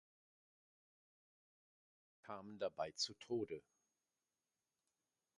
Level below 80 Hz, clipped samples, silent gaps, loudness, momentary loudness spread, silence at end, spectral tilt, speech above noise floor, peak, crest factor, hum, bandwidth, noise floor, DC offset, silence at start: -86 dBFS; under 0.1%; none; -46 LUFS; 12 LU; 1.8 s; -3.5 dB/octave; over 44 dB; -30 dBFS; 22 dB; none; 11 kHz; under -90 dBFS; under 0.1%; 2.25 s